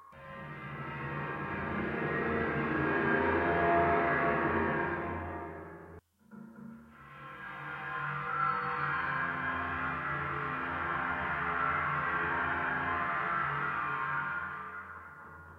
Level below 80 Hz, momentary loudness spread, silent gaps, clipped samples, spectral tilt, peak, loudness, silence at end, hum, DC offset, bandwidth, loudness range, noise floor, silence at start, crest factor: -60 dBFS; 19 LU; none; under 0.1%; -8 dB/octave; -16 dBFS; -32 LUFS; 0 s; none; under 0.1%; 12 kHz; 8 LU; -54 dBFS; 0 s; 18 dB